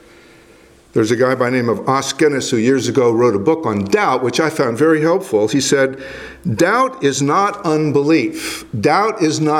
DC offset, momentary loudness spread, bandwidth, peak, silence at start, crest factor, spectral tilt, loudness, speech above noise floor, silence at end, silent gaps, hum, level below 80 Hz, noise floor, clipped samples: under 0.1%; 5 LU; 16 kHz; 0 dBFS; 0.95 s; 16 dB; -5 dB/octave; -15 LUFS; 31 dB; 0 s; none; none; -54 dBFS; -46 dBFS; under 0.1%